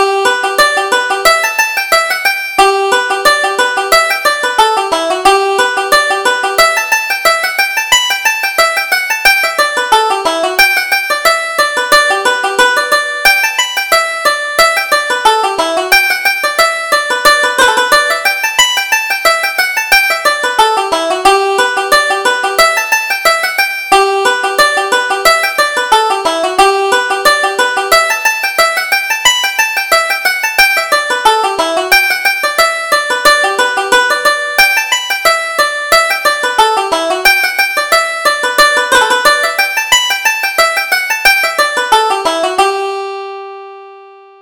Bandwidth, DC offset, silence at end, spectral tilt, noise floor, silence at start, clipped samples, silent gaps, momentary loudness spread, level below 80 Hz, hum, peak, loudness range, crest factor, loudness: over 20 kHz; under 0.1%; 0.3 s; 0.5 dB/octave; -36 dBFS; 0 s; 0.2%; none; 4 LU; -44 dBFS; none; 0 dBFS; 1 LU; 12 dB; -10 LUFS